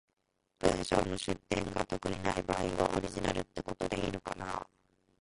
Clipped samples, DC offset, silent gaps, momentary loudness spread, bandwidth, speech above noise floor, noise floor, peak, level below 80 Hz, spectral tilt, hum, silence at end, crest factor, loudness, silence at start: under 0.1%; under 0.1%; none; 8 LU; 11.5 kHz; 46 dB; -81 dBFS; -10 dBFS; -52 dBFS; -5 dB/octave; none; 0.6 s; 24 dB; -35 LUFS; 0.6 s